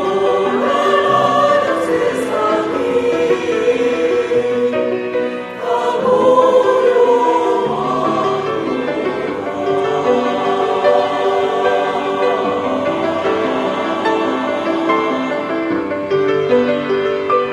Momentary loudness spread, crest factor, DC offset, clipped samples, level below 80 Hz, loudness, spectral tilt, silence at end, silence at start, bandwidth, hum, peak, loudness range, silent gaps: 7 LU; 16 dB; under 0.1%; under 0.1%; -56 dBFS; -16 LUFS; -5.5 dB/octave; 0 s; 0 s; 11.5 kHz; none; 0 dBFS; 3 LU; none